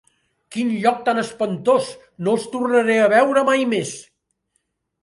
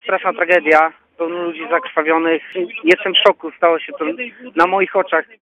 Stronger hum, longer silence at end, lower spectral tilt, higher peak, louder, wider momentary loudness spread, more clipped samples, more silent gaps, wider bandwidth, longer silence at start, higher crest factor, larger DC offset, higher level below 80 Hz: neither; first, 1 s vs 0.2 s; about the same, -5 dB/octave vs -4.5 dB/octave; about the same, -2 dBFS vs 0 dBFS; second, -19 LUFS vs -16 LUFS; about the same, 13 LU vs 11 LU; neither; neither; first, 11.5 kHz vs 10 kHz; first, 0.5 s vs 0.05 s; about the same, 18 dB vs 16 dB; neither; about the same, -66 dBFS vs -66 dBFS